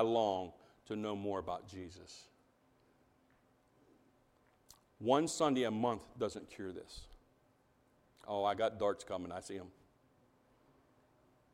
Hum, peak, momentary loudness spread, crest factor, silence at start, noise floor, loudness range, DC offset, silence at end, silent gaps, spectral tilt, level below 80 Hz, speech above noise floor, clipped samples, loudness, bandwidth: none; -16 dBFS; 20 LU; 24 dB; 0 s; -72 dBFS; 9 LU; under 0.1%; 1.85 s; none; -5 dB/octave; -70 dBFS; 35 dB; under 0.1%; -38 LUFS; 16 kHz